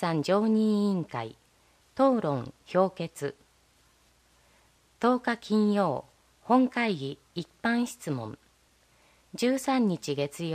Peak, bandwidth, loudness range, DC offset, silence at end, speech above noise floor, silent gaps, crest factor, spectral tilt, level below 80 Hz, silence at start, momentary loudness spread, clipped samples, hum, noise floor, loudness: -10 dBFS; 15.5 kHz; 3 LU; under 0.1%; 0 s; 37 dB; none; 18 dB; -6 dB/octave; -68 dBFS; 0 s; 13 LU; under 0.1%; none; -64 dBFS; -28 LUFS